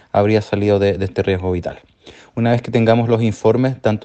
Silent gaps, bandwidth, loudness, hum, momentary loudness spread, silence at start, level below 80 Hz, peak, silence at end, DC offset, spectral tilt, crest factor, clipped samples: none; 8.4 kHz; -17 LUFS; none; 7 LU; 0.15 s; -46 dBFS; 0 dBFS; 0.05 s; under 0.1%; -8 dB/octave; 16 dB; under 0.1%